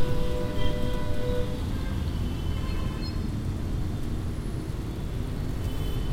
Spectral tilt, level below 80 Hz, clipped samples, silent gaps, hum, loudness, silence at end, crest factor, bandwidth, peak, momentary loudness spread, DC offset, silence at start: -7 dB/octave; -32 dBFS; under 0.1%; none; none; -32 LUFS; 0 s; 16 dB; 16 kHz; -12 dBFS; 3 LU; under 0.1%; 0 s